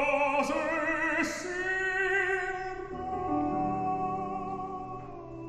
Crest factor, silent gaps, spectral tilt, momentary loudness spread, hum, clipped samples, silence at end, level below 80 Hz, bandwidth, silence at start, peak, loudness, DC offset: 16 dB; none; -5 dB/octave; 11 LU; none; under 0.1%; 0 s; -54 dBFS; 14.5 kHz; 0 s; -14 dBFS; -30 LUFS; under 0.1%